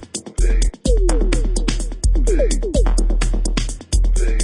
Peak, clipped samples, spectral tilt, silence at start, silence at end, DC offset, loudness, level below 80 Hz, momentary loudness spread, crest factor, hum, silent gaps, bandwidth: -2 dBFS; under 0.1%; -5 dB/octave; 0 s; 0 s; under 0.1%; -20 LUFS; -16 dBFS; 4 LU; 14 dB; none; none; 11.5 kHz